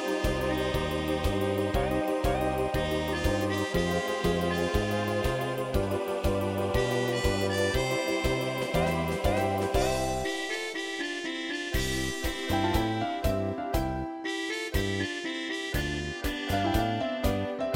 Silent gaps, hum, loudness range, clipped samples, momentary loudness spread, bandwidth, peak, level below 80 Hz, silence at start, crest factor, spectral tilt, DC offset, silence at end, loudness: none; none; 2 LU; under 0.1%; 5 LU; 17 kHz; -12 dBFS; -38 dBFS; 0 s; 16 dB; -5 dB/octave; under 0.1%; 0 s; -29 LUFS